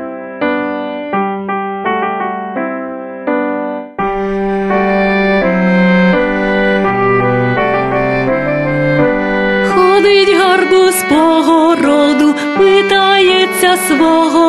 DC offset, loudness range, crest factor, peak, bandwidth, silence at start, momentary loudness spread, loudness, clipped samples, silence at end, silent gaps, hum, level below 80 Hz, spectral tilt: under 0.1%; 8 LU; 12 dB; 0 dBFS; 13 kHz; 0 s; 10 LU; -11 LUFS; under 0.1%; 0 s; none; none; -38 dBFS; -5 dB/octave